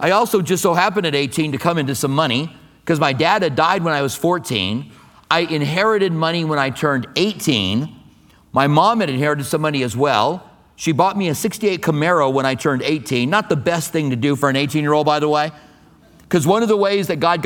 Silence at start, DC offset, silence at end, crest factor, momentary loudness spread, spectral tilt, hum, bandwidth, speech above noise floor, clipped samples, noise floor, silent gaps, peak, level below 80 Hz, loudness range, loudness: 0 s; under 0.1%; 0 s; 18 dB; 5 LU; -5 dB/octave; none; 19 kHz; 32 dB; under 0.1%; -49 dBFS; none; 0 dBFS; -56 dBFS; 1 LU; -18 LUFS